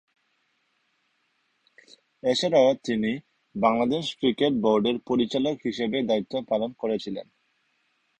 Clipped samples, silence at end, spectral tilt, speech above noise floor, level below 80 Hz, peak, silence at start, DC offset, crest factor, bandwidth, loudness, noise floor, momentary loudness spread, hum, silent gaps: under 0.1%; 0.95 s; -5.5 dB/octave; 47 dB; -64 dBFS; -8 dBFS; 2.25 s; under 0.1%; 18 dB; 9.6 kHz; -25 LUFS; -72 dBFS; 9 LU; none; none